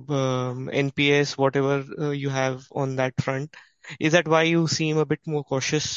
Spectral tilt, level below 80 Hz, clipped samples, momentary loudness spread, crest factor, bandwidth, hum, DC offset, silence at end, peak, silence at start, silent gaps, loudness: -5 dB/octave; -60 dBFS; under 0.1%; 9 LU; 20 dB; 7.8 kHz; none; under 0.1%; 0 s; -4 dBFS; 0 s; none; -24 LUFS